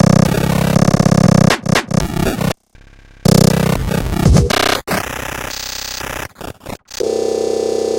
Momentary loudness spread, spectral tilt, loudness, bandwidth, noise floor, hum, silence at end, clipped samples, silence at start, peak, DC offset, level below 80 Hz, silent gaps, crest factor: 13 LU; -5.5 dB/octave; -15 LUFS; 17 kHz; -43 dBFS; none; 0 s; under 0.1%; 0 s; 0 dBFS; under 0.1%; -28 dBFS; none; 14 dB